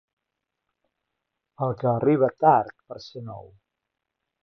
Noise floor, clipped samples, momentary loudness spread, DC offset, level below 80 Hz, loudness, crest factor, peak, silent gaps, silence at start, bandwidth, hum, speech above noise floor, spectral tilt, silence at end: -83 dBFS; under 0.1%; 20 LU; under 0.1%; -66 dBFS; -22 LUFS; 22 dB; -6 dBFS; none; 1.6 s; 6.4 kHz; none; 60 dB; -9 dB/octave; 1.05 s